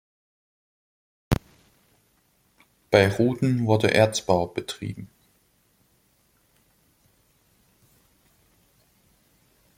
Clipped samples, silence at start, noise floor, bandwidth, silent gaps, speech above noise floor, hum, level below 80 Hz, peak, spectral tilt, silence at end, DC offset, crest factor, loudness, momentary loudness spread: under 0.1%; 1.3 s; -66 dBFS; 16.5 kHz; none; 44 dB; none; -50 dBFS; -2 dBFS; -5.5 dB/octave; 4.7 s; under 0.1%; 26 dB; -23 LUFS; 15 LU